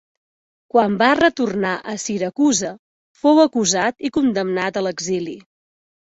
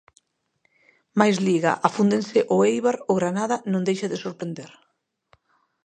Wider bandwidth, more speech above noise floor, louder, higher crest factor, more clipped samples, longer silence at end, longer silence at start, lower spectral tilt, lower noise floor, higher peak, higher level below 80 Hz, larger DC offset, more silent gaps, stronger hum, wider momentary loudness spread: second, 8 kHz vs 9.6 kHz; first, over 72 dB vs 48 dB; first, -18 LUFS vs -22 LUFS; about the same, 18 dB vs 22 dB; neither; second, 0.7 s vs 1.15 s; second, 0.75 s vs 1.15 s; second, -3.5 dB/octave vs -6 dB/octave; first, under -90 dBFS vs -70 dBFS; about the same, -2 dBFS vs -2 dBFS; first, -58 dBFS vs -70 dBFS; neither; first, 2.79-3.15 s vs none; neither; about the same, 10 LU vs 11 LU